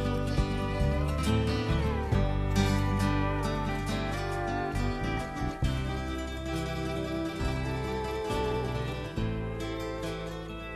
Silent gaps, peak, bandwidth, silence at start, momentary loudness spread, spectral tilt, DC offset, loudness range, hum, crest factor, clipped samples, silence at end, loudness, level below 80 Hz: none; -12 dBFS; 13 kHz; 0 s; 7 LU; -6.5 dB/octave; under 0.1%; 4 LU; none; 18 dB; under 0.1%; 0 s; -31 LUFS; -36 dBFS